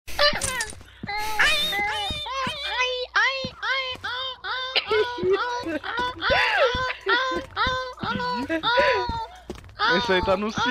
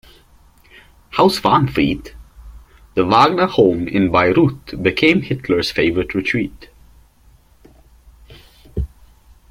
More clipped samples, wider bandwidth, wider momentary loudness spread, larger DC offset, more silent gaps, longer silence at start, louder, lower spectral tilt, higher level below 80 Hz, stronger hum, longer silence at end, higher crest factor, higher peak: neither; about the same, 16 kHz vs 16 kHz; second, 9 LU vs 15 LU; neither; neither; second, 0.05 s vs 1.15 s; second, -24 LUFS vs -16 LUFS; second, -3 dB/octave vs -6.5 dB/octave; second, -46 dBFS vs -40 dBFS; neither; second, 0 s vs 0.65 s; about the same, 18 dB vs 18 dB; second, -6 dBFS vs 0 dBFS